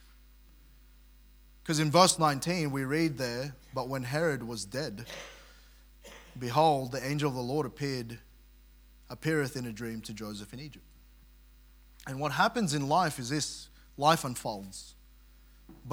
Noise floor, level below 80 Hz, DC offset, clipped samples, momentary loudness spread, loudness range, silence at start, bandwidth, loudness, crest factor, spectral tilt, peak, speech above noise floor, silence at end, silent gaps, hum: -57 dBFS; -58 dBFS; under 0.1%; under 0.1%; 20 LU; 9 LU; 1.65 s; 18 kHz; -30 LUFS; 28 dB; -4.5 dB/octave; -6 dBFS; 26 dB; 0 s; none; none